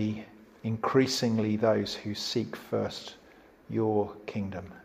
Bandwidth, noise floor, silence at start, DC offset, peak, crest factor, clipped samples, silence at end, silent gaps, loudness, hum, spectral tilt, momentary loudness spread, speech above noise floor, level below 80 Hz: 15.5 kHz; -55 dBFS; 0 s; under 0.1%; -10 dBFS; 20 dB; under 0.1%; 0 s; none; -30 LUFS; none; -5.5 dB/octave; 13 LU; 25 dB; -66 dBFS